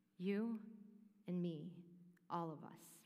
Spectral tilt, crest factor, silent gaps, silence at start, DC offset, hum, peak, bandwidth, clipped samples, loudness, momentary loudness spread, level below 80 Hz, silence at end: -7.5 dB/octave; 16 dB; none; 0.2 s; under 0.1%; none; -32 dBFS; 15.5 kHz; under 0.1%; -46 LUFS; 20 LU; under -90 dBFS; 0.05 s